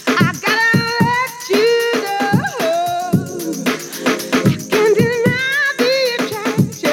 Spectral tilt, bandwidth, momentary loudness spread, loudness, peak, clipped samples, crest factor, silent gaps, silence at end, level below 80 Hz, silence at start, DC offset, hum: -4.5 dB/octave; 18.5 kHz; 6 LU; -16 LUFS; -2 dBFS; under 0.1%; 14 dB; none; 0 s; -50 dBFS; 0 s; under 0.1%; none